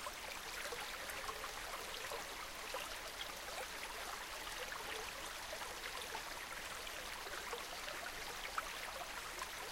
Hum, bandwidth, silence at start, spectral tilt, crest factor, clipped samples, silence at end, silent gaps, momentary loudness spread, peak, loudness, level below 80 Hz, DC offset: none; 17 kHz; 0 s; -0.5 dB/octave; 20 dB; under 0.1%; 0 s; none; 2 LU; -26 dBFS; -45 LUFS; -62 dBFS; under 0.1%